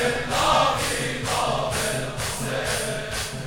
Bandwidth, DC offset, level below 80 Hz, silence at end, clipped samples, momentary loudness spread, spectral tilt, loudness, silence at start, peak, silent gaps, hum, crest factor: over 20 kHz; under 0.1%; -42 dBFS; 0 s; under 0.1%; 8 LU; -3 dB/octave; -24 LUFS; 0 s; -6 dBFS; none; none; 18 dB